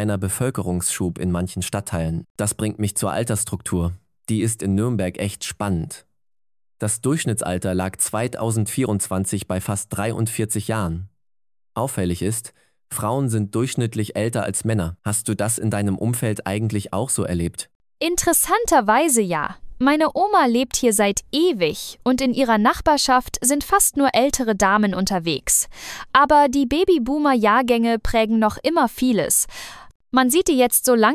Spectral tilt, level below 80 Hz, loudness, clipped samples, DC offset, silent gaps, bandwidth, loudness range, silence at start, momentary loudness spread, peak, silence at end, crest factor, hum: -4.5 dB/octave; -40 dBFS; -20 LUFS; under 0.1%; under 0.1%; 2.30-2.35 s, 17.75-17.80 s, 29.95-30.00 s; 16 kHz; 7 LU; 0 s; 9 LU; -2 dBFS; 0 s; 20 dB; none